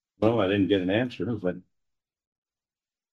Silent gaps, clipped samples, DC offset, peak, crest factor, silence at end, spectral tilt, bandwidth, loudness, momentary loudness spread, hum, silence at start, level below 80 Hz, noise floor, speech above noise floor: none; under 0.1%; under 0.1%; -8 dBFS; 20 dB; 1.55 s; -8 dB/octave; 7.2 kHz; -26 LUFS; 9 LU; none; 0.2 s; -64 dBFS; under -90 dBFS; over 65 dB